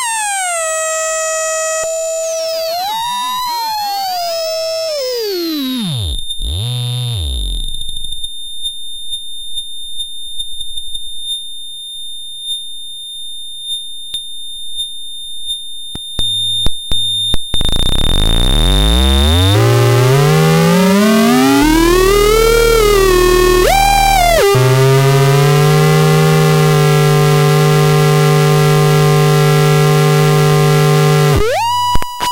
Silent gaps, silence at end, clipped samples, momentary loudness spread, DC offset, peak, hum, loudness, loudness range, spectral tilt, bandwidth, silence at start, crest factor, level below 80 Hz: none; 0 s; under 0.1%; 13 LU; under 0.1%; 0 dBFS; none; -12 LUFS; 12 LU; -5 dB/octave; 17 kHz; 0 s; 12 dB; -22 dBFS